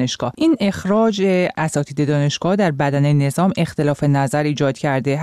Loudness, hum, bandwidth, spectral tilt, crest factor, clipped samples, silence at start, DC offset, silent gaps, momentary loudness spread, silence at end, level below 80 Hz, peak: -18 LUFS; none; 13 kHz; -6.5 dB/octave; 10 dB; under 0.1%; 0 s; under 0.1%; none; 3 LU; 0 s; -52 dBFS; -8 dBFS